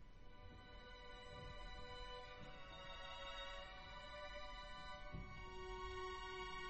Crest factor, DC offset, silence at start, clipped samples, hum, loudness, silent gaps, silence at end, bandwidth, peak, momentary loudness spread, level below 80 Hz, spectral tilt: 14 dB; under 0.1%; 0 s; under 0.1%; none; -54 LUFS; none; 0 s; 8.2 kHz; -38 dBFS; 9 LU; -60 dBFS; -4 dB/octave